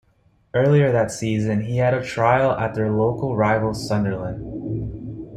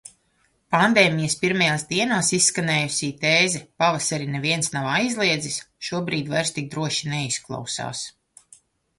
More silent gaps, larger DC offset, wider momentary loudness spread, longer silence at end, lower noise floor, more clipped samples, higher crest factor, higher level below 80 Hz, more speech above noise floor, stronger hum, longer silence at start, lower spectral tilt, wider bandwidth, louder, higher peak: neither; neither; about the same, 12 LU vs 11 LU; second, 0 s vs 0.9 s; second, -60 dBFS vs -66 dBFS; neither; second, 16 dB vs 22 dB; first, -46 dBFS vs -60 dBFS; about the same, 40 dB vs 43 dB; neither; first, 0.55 s vs 0.05 s; first, -7 dB/octave vs -3 dB/octave; about the same, 12.5 kHz vs 11.5 kHz; about the same, -21 LUFS vs -22 LUFS; about the same, -4 dBFS vs -2 dBFS